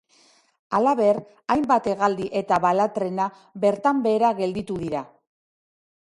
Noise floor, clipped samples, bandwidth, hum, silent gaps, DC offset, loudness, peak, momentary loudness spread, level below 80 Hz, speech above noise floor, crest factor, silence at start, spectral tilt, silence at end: -59 dBFS; under 0.1%; 11.5 kHz; none; none; under 0.1%; -23 LUFS; -6 dBFS; 8 LU; -60 dBFS; 37 dB; 18 dB; 0.7 s; -6.5 dB/octave; 1.05 s